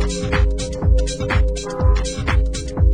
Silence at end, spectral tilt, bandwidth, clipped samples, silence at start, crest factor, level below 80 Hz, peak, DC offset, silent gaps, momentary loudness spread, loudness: 0 s; -5.5 dB/octave; 10 kHz; under 0.1%; 0 s; 14 dB; -18 dBFS; -4 dBFS; 0.7%; none; 3 LU; -20 LUFS